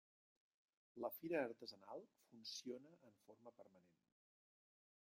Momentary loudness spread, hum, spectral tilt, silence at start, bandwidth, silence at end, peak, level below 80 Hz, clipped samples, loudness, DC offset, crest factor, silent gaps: 23 LU; none; -4 dB/octave; 0.95 s; 15.5 kHz; 1.25 s; -30 dBFS; under -90 dBFS; under 0.1%; -50 LUFS; under 0.1%; 24 dB; none